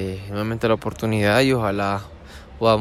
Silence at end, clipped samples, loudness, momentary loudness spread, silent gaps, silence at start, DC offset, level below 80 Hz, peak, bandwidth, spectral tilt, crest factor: 0 s; under 0.1%; -21 LUFS; 18 LU; none; 0 s; under 0.1%; -44 dBFS; -4 dBFS; 15.5 kHz; -6 dB/octave; 16 dB